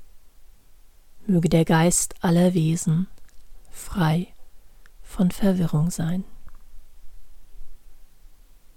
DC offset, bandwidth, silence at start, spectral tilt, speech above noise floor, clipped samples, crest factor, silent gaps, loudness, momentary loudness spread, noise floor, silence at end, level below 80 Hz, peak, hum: under 0.1%; 16.5 kHz; 0 s; -5.5 dB/octave; 28 dB; under 0.1%; 18 dB; none; -22 LUFS; 17 LU; -48 dBFS; 0.1 s; -42 dBFS; -6 dBFS; none